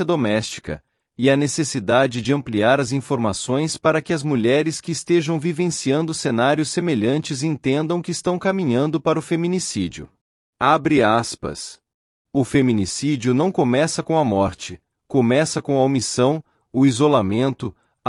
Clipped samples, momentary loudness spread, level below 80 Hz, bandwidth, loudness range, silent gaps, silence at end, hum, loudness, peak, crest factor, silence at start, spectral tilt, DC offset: under 0.1%; 9 LU; -54 dBFS; 12 kHz; 2 LU; 10.21-10.53 s, 11.94-12.25 s; 0 s; none; -20 LUFS; -4 dBFS; 16 dB; 0 s; -5.5 dB/octave; under 0.1%